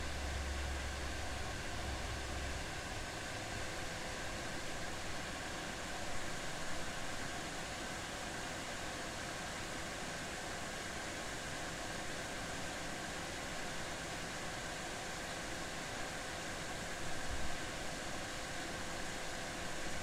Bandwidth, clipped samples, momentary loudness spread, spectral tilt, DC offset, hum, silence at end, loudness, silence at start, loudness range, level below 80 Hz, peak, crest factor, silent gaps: 16 kHz; under 0.1%; 1 LU; -3 dB/octave; under 0.1%; none; 0 s; -42 LUFS; 0 s; 0 LU; -50 dBFS; -28 dBFS; 14 dB; none